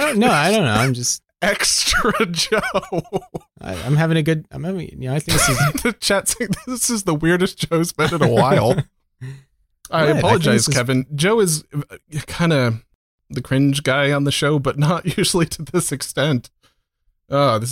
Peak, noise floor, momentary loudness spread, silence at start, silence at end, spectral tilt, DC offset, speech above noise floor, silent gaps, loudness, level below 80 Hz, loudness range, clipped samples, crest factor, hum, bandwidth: 0 dBFS; -66 dBFS; 13 LU; 0 s; 0 s; -4.5 dB/octave; under 0.1%; 48 dB; 12.95-13.18 s; -18 LUFS; -42 dBFS; 2 LU; under 0.1%; 18 dB; none; 16.5 kHz